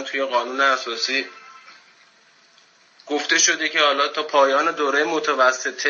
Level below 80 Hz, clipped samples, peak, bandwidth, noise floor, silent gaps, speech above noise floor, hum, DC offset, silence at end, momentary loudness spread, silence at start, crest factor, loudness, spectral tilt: under -90 dBFS; under 0.1%; -4 dBFS; 7.4 kHz; -55 dBFS; none; 35 dB; none; under 0.1%; 0 s; 7 LU; 0 s; 18 dB; -19 LUFS; 0.5 dB/octave